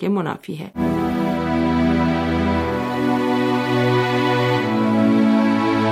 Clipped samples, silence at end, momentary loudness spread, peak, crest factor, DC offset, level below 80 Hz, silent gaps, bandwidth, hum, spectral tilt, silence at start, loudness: under 0.1%; 0 s; 6 LU; -6 dBFS; 12 dB; under 0.1%; -40 dBFS; none; 15 kHz; none; -7 dB/octave; 0 s; -19 LUFS